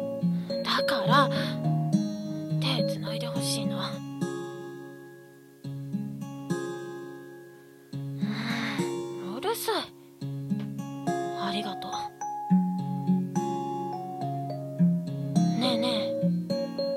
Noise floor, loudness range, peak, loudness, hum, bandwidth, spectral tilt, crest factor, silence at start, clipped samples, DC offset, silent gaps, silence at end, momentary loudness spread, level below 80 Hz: -51 dBFS; 10 LU; -8 dBFS; -29 LUFS; none; 15.5 kHz; -6 dB/octave; 22 dB; 0 s; under 0.1%; under 0.1%; none; 0 s; 15 LU; -72 dBFS